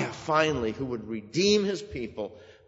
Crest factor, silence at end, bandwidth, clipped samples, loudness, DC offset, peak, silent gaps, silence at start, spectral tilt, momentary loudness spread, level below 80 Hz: 20 dB; 0.15 s; 8 kHz; under 0.1%; -28 LUFS; under 0.1%; -8 dBFS; none; 0 s; -4.5 dB/octave; 13 LU; -54 dBFS